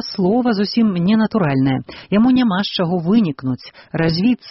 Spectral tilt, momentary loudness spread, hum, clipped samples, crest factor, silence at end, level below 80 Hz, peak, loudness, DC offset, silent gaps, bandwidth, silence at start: -5.5 dB/octave; 9 LU; none; under 0.1%; 12 dB; 0 s; -48 dBFS; -4 dBFS; -17 LUFS; under 0.1%; none; 6 kHz; 0 s